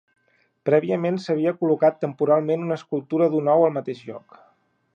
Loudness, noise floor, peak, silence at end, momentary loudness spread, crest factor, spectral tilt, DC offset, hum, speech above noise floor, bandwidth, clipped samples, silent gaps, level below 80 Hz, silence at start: -22 LUFS; -66 dBFS; -6 dBFS; 0.75 s; 12 LU; 16 dB; -8.5 dB/octave; under 0.1%; none; 44 dB; 7.4 kHz; under 0.1%; none; -76 dBFS; 0.65 s